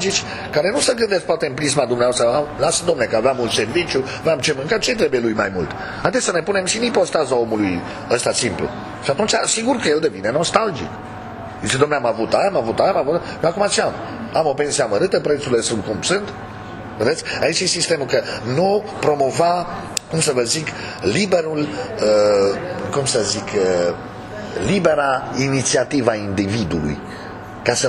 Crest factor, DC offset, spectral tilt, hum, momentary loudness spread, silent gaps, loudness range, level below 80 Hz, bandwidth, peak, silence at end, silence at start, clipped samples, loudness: 18 dB; under 0.1%; -3.5 dB/octave; none; 9 LU; none; 2 LU; -46 dBFS; 13 kHz; 0 dBFS; 0 s; 0 s; under 0.1%; -19 LUFS